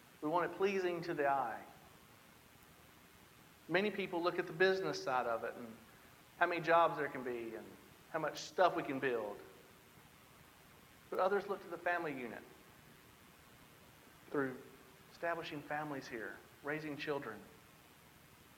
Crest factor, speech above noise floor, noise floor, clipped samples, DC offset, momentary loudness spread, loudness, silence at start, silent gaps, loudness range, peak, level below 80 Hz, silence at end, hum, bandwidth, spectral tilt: 24 dB; 25 dB; -62 dBFS; under 0.1%; under 0.1%; 24 LU; -38 LUFS; 0.15 s; none; 8 LU; -16 dBFS; -76 dBFS; 0.15 s; none; 17.5 kHz; -5 dB/octave